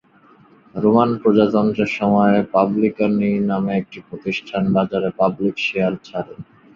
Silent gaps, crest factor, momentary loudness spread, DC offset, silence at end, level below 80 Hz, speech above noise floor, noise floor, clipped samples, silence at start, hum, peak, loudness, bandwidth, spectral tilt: none; 16 dB; 12 LU; under 0.1%; 0.35 s; -54 dBFS; 33 dB; -51 dBFS; under 0.1%; 0.75 s; none; -2 dBFS; -18 LUFS; 7 kHz; -8 dB/octave